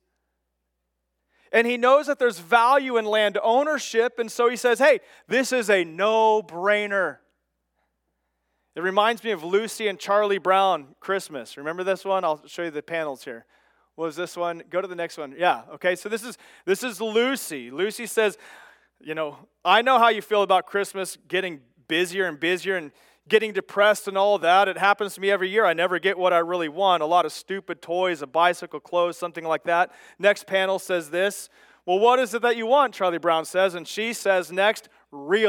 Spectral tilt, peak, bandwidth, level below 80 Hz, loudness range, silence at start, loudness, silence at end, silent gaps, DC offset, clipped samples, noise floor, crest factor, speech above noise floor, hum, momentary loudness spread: -3 dB/octave; -4 dBFS; 18 kHz; -80 dBFS; 6 LU; 1.5 s; -23 LUFS; 0 s; none; under 0.1%; under 0.1%; -78 dBFS; 20 dB; 55 dB; none; 12 LU